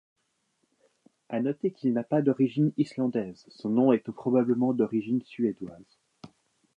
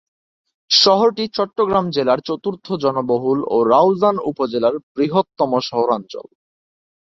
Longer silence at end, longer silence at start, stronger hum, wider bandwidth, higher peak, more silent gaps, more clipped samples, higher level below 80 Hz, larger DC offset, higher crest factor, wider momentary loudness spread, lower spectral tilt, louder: second, 0.5 s vs 0.95 s; first, 1.3 s vs 0.7 s; neither; about the same, 7.2 kHz vs 7.8 kHz; second, -10 dBFS vs 0 dBFS; second, none vs 4.83-4.95 s; neither; second, -74 dBFS vs -60 dBFS; neither; about the same, 18 dB vs 18 dB; about the same, 10 LU vs 9 LU; first, -9.5 dB/octave vs -5 dB/octave; second, -27 LUFS vs -17 LUFS